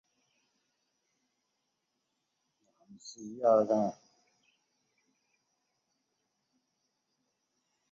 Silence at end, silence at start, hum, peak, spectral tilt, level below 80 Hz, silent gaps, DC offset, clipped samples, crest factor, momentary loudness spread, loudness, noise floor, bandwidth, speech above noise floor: 4 s; 3.05 s; none; -14 dBFS; -6.5 dB/octave; -84 dBFS; none; under 0.1%; under 0.1%; 24 dB; 23 LU; -29 LUFS; -83 dBFS; 7.4 kHz; 53 dB